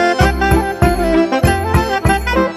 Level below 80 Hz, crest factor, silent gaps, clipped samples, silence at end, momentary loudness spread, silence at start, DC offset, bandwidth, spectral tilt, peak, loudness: -22 dBFS; 12 dB; none; under 0.1%; 0 s; 2 LU; 0 s; under 0.1%; 15 kHz; -6 dB/octave; 0 dBFS; -14 LUFS